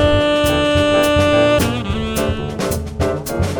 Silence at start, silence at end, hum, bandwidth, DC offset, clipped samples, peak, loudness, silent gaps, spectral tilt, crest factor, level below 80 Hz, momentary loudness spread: 0 s; 0 s; none; over 20 kHz; under 0.1%; under 0.1%; -2 dBFS; -16 LUFS; none; -5 dB/octave; 14 dB; -28 dBFS; 8 LU